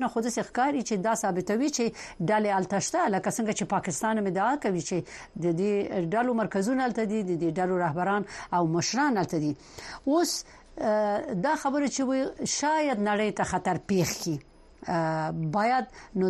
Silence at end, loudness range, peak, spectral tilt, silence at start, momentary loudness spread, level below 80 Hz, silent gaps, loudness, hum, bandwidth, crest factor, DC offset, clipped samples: 0 s; 1 LU; -14 dBFS; -5 dB/octave; 0 s; 6 LU; -58 dBFS; none; -28 LUFS; none; 13 kHz; 14 dB; under 0.1%; under 0.1%